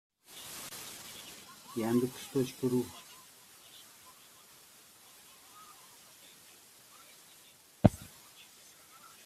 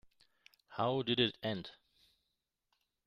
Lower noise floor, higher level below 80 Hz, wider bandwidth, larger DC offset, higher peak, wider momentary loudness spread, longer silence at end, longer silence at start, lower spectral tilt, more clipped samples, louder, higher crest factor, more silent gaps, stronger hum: second, -59 dBFS vs -86 dBFS; first, -58 dBFS vs -74 dBFS; first, 16 kHz vs 14 kHz; neither; first, -4 dBFS vs -16 dBFS; first, 23 LU vs 16 LU; second, 0.2 s vs 1.35 s; second, 0.3 s vs 0.7 s; about the same, -6 dB/octave vs -7 dB/octave; neither; about the same, -35 LUFS vs -35 LUFS; first, 34 dB vs 24 dB; neither; neither